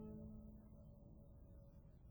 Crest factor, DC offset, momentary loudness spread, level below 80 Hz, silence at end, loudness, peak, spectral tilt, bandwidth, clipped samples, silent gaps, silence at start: 16 dB; under 0.1%; 8 LU; -64 dBFS; 0 s; -61 LUFS; -42 dBFS; -10.5 dB/octave; over 20 kHz; under 0.1%; none; 0 s